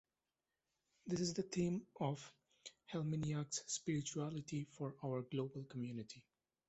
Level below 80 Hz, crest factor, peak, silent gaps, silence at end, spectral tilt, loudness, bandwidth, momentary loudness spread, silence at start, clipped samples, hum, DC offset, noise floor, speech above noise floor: -74 dBFS; 18 dB; -26 dBFS; none; 0.5 s; -5.5 dB/octave; -44 LUFS; 8.2 kHz; 16 LU; 1.05 s; under 0.1%; none; under 0.1%; under -90 dBFS; over 47 dB